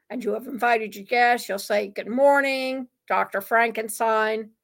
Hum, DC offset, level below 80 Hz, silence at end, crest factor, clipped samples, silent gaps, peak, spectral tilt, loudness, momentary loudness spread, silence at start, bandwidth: none; under 0.1%; -76 dBFS; 0.15 s; 16 dB; under 0.1%; none; -6 dBFS; -3 dB/octave; -23 LUFS; 10 LU; 0.1 s; 17 kHz